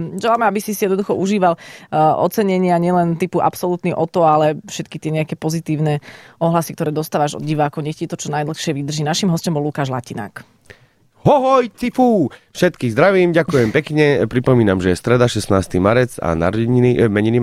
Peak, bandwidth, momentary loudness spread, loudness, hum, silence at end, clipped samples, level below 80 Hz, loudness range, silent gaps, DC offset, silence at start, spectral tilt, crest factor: -2 dBFS; 15.5 kHz; 8 LU; -17 LUFS; none; 0 s; under 0.1%; -46 dBFS; 5 LU; none; under 0.1%; 0 s; -6 dB/octave; 14 dB